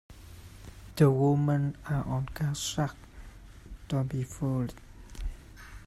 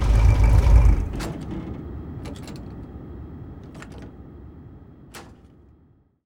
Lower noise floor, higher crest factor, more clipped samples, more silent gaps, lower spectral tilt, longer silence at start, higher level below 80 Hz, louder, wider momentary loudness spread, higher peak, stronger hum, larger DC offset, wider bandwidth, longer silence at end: second, -48 dBFS vs -58 dBFS; about the same, 20 dB vs 20 dB; neither; neither; about the same, -6.5 dB/octave vs -7.5 dB/octave; about the same, 0.1 s vs 0 s; second, -46 dBFS vs -24 dBFS; second, -30 LUFS vs -22 LUFS; about the same, 25 LU vs 26 LU; second, -10 dBFS vs -4 dBFS; neither; neither; first, 14.5 kHz vs 10 kHz; second, 0 s vs 1.05 s